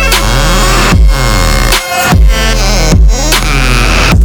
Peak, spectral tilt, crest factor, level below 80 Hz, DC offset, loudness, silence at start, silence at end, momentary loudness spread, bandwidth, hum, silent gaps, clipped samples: 0 dBFS; -4 dB/octave; 6 dB; -8 dBFS; under 0.1%; -8 LUFS; 0 s; 0 s; 2 LU; over 20 kHz; none; none; 2%